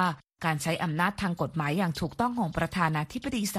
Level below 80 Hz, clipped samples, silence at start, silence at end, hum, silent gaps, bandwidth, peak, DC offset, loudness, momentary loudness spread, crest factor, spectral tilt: -52 dBFS; under 0.1%; 0 s; 0 s; none; none; 15 kHz; -12 dBFS; under 0.1%; -29 LUFS; 4 LU; 18 dB; -5.5 dB/octave